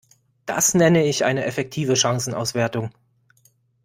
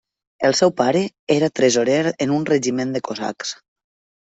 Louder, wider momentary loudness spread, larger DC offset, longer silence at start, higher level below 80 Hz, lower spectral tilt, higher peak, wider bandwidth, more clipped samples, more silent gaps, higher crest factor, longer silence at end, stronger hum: about the same, -20 LUFS vs -19 LUFS; about the same, 12 LU vs 10 LU; neither; about the same, 0.45 s vs 0.4 s; about the same, -58 dBFS vs -62 dBFS; about the same, -4 dB/octave vs -4.5 dB/octave; about the same, -4 dBFS vs -2 dBFS; first, 16.5 kHz vs 8.4 kHz; neither; second, none vs 1.19-1.27 s; about the same, 18 dB vs 18 dB; first, 0.95 s vs 0.75 s; neither